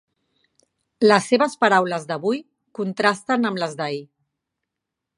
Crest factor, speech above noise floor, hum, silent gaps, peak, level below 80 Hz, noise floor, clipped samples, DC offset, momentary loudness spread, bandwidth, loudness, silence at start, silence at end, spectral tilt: 22 dB; 63 dB; none; none; 0 dBFS; -74 dBFS; -83 dBFS; under 0.1%; under 0.1%; 12 LU; 11.5 kHz; -21 LUFS; 1 s; 1.15 s; -4.5 dB/octave